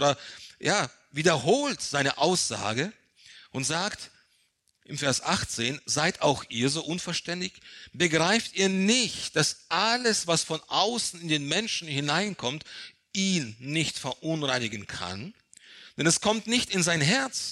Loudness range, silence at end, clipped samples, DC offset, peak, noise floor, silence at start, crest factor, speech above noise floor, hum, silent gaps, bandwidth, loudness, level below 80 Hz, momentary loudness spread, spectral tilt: 5 LU; 0 s; under 0.1%; under 0.1%; -8 dBFS; -70 dBFS; 0 s; 20 dB; 42 dB; none; none; 15 kHz; -26 LUFS; -62 dBFS; 12 LU; -3 dB/octave